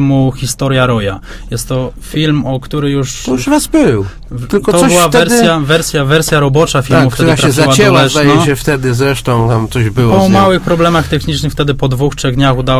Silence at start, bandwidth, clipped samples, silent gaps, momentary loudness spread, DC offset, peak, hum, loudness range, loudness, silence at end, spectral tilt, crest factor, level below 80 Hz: 0 s; 16 kHz; 0.3%; none; 9 LU; under 0.1%; 0 dBFS; none; 5 LU; -10 LUFS; 0 s; -5 dB/octave; 10 dB; -28 dBFS